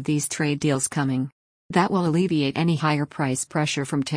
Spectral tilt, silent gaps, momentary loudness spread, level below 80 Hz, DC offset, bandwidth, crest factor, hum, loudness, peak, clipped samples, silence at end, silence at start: -5 dB/octave; 1.32-1.69 s; 4 LU; -60 dBFS; under 0.1%; 10.5 kHz; 16 dB; none; -23 LUFS; -8 dBFS; under 0.1%; 0 s; 0 s